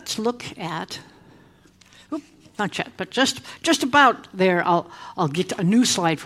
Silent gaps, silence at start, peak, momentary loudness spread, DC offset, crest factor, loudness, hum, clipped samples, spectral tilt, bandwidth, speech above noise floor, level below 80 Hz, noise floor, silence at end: none; 0.05 s; -2 dBFS; 17 LU; under 0.1%; 20 dB; -21 LUFS; none; under 0.1%; -4 dB/octave; 15.5 kHz; 31 dB; -62 dBFS; -53 dBFS; 0 s